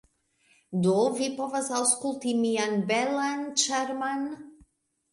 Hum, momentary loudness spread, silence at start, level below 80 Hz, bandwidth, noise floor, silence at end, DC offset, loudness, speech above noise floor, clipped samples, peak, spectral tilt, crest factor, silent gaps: none; 7 LU; 0.7 s; -70 dBFS; 11.5 kHz; -67 dBFS; 0.6 s; under 0.1%; -27 LUFS; 40 dB; under 0.1%; -8 dBFS; -3.5 dB/octave; 20 dB; none